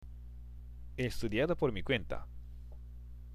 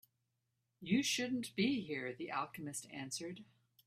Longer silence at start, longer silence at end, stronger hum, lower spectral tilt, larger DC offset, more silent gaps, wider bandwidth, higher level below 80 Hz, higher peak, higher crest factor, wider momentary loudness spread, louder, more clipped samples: second, 0 s vs 0.8 s; second, 0 s vs 0.45 s; first, 60 Hz at -50 dBFS vs none; first, -6 dB/octave vs -3.5 dB/octave; neither; neither; about the same, 15 kHz vs 15.5 kHz; first, -46 dBFS vs -80 dBFS; first, -18 dBFS vs -22 dBFS; about the same, 20 dB vs 20 dB; first, 19 LU vs 11 LU; first, -35 LUFS vs -39 LUFS; neither